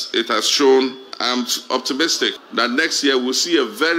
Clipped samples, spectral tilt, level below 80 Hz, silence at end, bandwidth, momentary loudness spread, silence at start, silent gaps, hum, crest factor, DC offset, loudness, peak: under 0.1%; -1 dB/octave; -82 dBFS; 0 s; 16 kHz; 6 LU; 0 s; none; none; 14 dB; under 0.1%; -17 LUFS; -4 dBFS